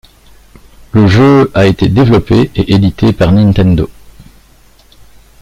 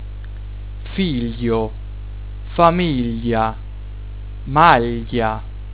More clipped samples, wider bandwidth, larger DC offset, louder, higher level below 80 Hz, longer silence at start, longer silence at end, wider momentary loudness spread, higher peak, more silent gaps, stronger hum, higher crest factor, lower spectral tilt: neither; first, 11.5 kHz vs 4 kHz; second, under 0.1% vs 1%; first, -9 LUFS vs -18 LUFS; about the same, -30 dBFS vs -30 dBFS; first, 0.95 s vs 0 s; first, 1.55 s vs 0 s; second, 5 LU vs 20 LU; about the same, 0 dBFS vs 0 dBFS; neither; second, none vs 50 Hz at -30 dBFS; second, 10 dB vs 20 dB; second, -8 dB/octave vs -10.5 dB/octave